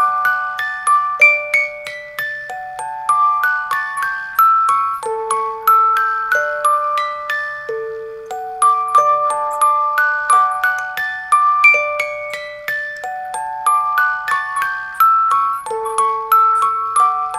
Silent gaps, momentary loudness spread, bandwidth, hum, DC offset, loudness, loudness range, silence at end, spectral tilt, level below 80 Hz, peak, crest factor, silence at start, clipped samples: none; 13 LU; 15 kHz; none; under 0.1%; -15 LUFS; 3 LU; 0 s; 0 dB/octave; -60 dBFS; 0 dBFS; 16 dB; 0 s; under 0.1%